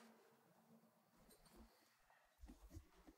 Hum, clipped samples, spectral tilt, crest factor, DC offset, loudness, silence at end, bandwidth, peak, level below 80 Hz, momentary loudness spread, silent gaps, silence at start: none; under 0.1%; -5 dB/octave; 20 dB; under 0.1%; -67 LUFS; 0 s; 16 kHz; -48 dBFS; -72 dBFS; 6 LU; none; 0 s